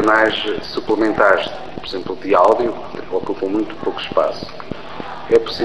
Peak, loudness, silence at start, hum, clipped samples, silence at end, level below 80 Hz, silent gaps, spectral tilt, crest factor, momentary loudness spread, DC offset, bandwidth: 0 dBFS; -18 LUFS; 0 s; none; under 0.1%; 0 s; -48 dBFS; none; -5 dB/octave; 18 dB; 16 LU; 2%; 9.8 kHz